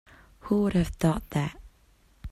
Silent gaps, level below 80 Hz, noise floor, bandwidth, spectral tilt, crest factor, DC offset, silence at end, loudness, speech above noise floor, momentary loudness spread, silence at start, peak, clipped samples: none; -44 dBFS; -61 dBFS; 15 kHz; -7 dB/octave; 18 dB; under 0.1%; 0 s; -27 LUFS; 35 dB; 18 LU; 0.45 s; -12 dBFS; under 0.1%